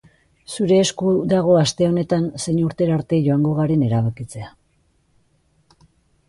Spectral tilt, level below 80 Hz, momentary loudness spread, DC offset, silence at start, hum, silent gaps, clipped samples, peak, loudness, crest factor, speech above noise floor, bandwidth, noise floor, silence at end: -6.5 dB/octave; -52 dBFS; 15 LU; under 0.1%; 0.5 s; none; none; under 0.1%; -4 dBFS; -19 LUFS; 16 dB; 44 dB; 11.5 kHz; -62 dBFS; 1.8 s